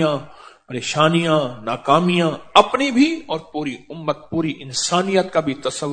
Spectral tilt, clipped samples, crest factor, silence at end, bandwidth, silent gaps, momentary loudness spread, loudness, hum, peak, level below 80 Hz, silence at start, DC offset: -4.5 dB/octave; under 0.1%; 20 dB; 0 s; 9.4 kHz; none; 12 LU; -19 LUFS; none; 0 dBFS; -56 dBFS; 0 s; under 0.1%